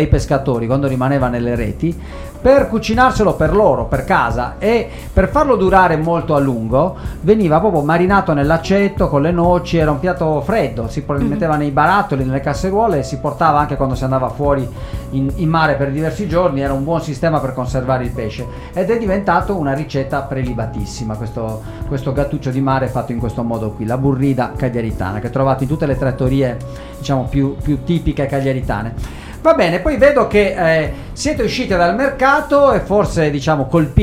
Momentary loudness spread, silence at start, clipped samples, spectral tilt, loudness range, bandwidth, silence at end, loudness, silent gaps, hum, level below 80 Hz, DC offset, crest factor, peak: 9 LU; 0 s; under 0.1%; -7 dB/octave; 5 LU; 16 kHz; 0 s; -16 LUFS; none; none; -30 dBFS; under 0.1%; 16 dB; 0 dBFS